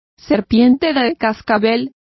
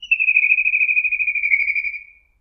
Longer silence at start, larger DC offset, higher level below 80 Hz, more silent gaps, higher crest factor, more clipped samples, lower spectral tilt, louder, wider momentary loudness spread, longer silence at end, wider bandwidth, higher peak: first, 0.3 s vs 0 s; neither; first, -46 dBFS vs -58 dBFS; neither; about the same, 14 dB vs 16 dB; neither; first, -7 dB/octave vs 1 dB/octave; about the same, -15 LUFS vs -15 LUFS; about the same, 7 LU vs 9 LU; second, 0.25 s vs 0.4 s; about the same, 6 kHz vs 6.2 kHz; about the same, -2 dBFS vs -4 dBFS